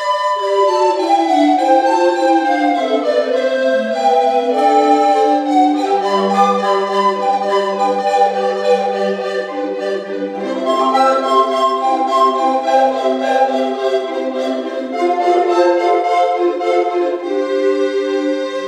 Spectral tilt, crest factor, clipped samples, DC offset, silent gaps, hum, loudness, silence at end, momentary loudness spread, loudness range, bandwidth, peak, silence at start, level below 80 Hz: -4.5 dB/octave; 14 dB; under 0.1%; under 0.1%; none; none; -15 LUFS; 0 s; 7 LU; 3 LU; 12 kHz; 0 dBFS; 0 s; -72 dBFS